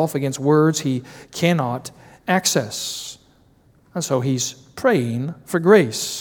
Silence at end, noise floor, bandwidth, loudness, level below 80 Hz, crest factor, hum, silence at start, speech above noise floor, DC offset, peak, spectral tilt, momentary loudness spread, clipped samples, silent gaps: 0 s; -55 dBFS; over 20 kHz; -20 LUFS; -62 dBFS; 20 dB; none; 0 s; 35 dB; under 0.1%; 0 dBFS; -4.5 dB/octave; 16 LU; under 0.1%; none